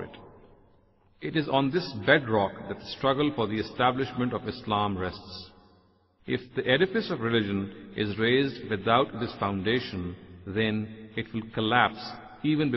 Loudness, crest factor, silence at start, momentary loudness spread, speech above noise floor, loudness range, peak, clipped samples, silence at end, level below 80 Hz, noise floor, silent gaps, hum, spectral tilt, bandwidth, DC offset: -28 LUFS; 22 dB; 0 s; 13 LU; 35 dB; 3 LU; -6 dBFS; under 0.1%; 0 s; -58 dBFS; -63 dBFS; none; none; -7.5 dB/octave; 6 kHz; under 0.1%